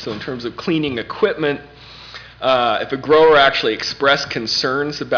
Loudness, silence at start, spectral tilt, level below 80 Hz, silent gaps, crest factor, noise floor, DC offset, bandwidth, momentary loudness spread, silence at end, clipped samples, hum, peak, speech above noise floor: -17 LUFS; 0 s; -4 dB/octave; -50 dBFS; none; 14 dB; -37 dBFS; under 0.1%; 5.4 kHz; 16 LU; 0 s; under 0.1%; none; -4 dBFS; 20 dB